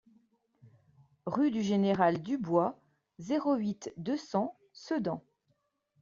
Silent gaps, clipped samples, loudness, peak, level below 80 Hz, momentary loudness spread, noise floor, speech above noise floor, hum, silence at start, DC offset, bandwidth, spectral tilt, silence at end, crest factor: none; under 0.1%; -32 LUFS; -12 dBFS; -72 dBFS; 11 LU; -77 dBFS; 46 dB; none; 0.65 s; under 0.1%; 7.4 kHz; -6 dB/octave; 0.85 s; 20 dB